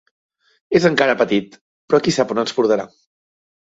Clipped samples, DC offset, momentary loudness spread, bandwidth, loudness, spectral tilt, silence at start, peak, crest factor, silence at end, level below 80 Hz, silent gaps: under 0.1%; under 0.1%; 6 LU; 8 kHz; -17 LUFS; -5 dB/octave; 0.7 s; -2 dBFS; 18 dB; 0.75 s; -58 dBFS; 1.61-1.88 s